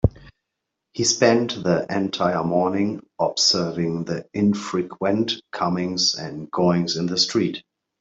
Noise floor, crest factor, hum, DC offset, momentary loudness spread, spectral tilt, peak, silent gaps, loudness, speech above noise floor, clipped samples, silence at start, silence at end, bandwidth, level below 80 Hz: -81 dBFS; 20 dB; none; under 0.1%; 9 LU; -4 dB/octave; -4 dBFS; none; -22 LUFS; 59 dB; under 0.1%; 0.05 s; 0.4 s; 8 kHz; -44 dBFS